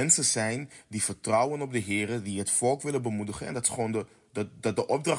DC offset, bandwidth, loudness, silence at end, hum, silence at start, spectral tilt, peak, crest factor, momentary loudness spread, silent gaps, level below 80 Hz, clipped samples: under 0.1%; 11.5 kHz; -28 LUFS; 0 s; none; 0 s; -3.5 dB/octave; -8 dBFS; 22 dB; 10 LU; none; -64 dBFS; under 0.1%